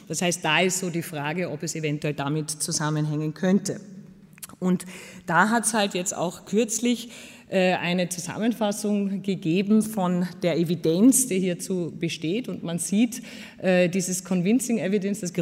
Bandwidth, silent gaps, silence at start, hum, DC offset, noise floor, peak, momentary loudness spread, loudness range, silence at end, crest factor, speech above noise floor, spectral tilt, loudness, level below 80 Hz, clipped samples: 16 kHz; none; 0.1 s; none; under 0.1%; -45 dBFS; -6 dBFS; 9 LU; 4 LU; 0 s; 20 dB; 20 dB; -4.5 dB/octave; -24 LUFS; -68 dBFS; under 0.1%